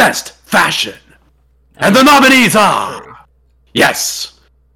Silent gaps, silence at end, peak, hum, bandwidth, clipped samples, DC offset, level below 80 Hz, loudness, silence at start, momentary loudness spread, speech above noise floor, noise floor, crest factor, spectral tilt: none; 0.45 s; -2 dBFS; none; 18 kHz; under 0.1%; under 0.1%; -48 dBFS; -10 LUFS; 0 s; 17 LU; 41 dB; -52 dBFS; 12 dB; -3 dB/octave